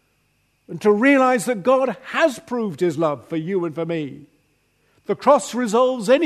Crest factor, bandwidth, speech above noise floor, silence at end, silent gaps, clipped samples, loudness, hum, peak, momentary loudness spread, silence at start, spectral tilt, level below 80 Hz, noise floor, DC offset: 18 dB; 13.5 kHz; 46 dB; 0 s; none; under 0.1%; -20 LUFS; none; -2 dBFS; 12 LU; 0.7 s; -5 dB/octave; -68 dBFS; -65 dBFS; under 0.1%